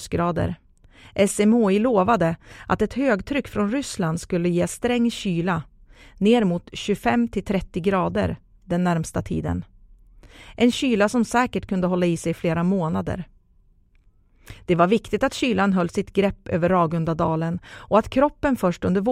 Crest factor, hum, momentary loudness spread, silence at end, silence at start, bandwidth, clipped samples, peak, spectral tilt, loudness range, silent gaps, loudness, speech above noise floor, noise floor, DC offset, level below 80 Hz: 18 dB; none; 9 LU; 0 s; 0 s; 14.5 kHz; under 0.1%; -4 dBFS; -6 dB/octave; 3 LU; none; -22 LUFS; 36 dB; -57 dBFS; under 0.1%; -44 dBFS